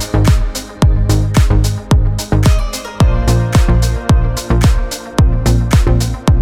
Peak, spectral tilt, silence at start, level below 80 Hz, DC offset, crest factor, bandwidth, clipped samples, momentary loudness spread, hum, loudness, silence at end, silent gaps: -2 dBFS; -6 dB/octave; 0 s; -14 dBFS; under 0.1%; 10 dB; 16.5 kHz; under 0.1%; 4 LU; none; -14 LUFS; 0 s; none